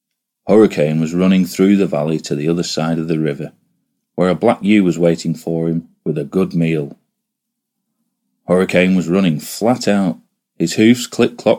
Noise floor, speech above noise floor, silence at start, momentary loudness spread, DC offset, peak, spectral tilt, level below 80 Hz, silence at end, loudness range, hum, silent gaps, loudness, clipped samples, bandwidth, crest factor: -77 dBFS; 63 dB; 0.45 s; 10 LU; under 0.1%; 0 dBFS; -6.5 dB/octave; -56 dBFS; 0 s; 5 LU; none; none; -16 LUFS; under 0.1%; 16.5 kHz; 16 dB